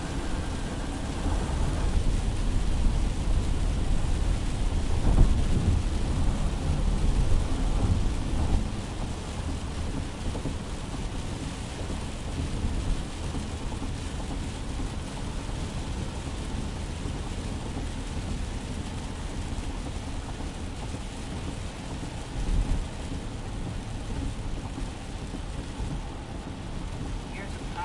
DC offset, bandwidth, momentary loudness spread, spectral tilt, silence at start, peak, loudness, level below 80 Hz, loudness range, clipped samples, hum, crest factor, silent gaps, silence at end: under 0.1%; 11.5 kHz; 8 LU; -5.5 dB/octave; 0 s; -6 dBFS; -32 LUFS; -30 dBFS; 8 LU; under 0.1%; none; 22 dB; none; 0 s